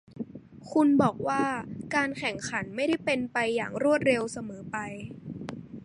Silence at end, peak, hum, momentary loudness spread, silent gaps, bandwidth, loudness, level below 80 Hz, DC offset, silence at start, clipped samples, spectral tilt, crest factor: 0 s; -10 dBFS; none; 17 LU; none; 11.5 kHz; -28 LUFS; -62 dBFS; under 0.1%; 0.1 s; under 0.1%; -5 dB/octave; 20 dB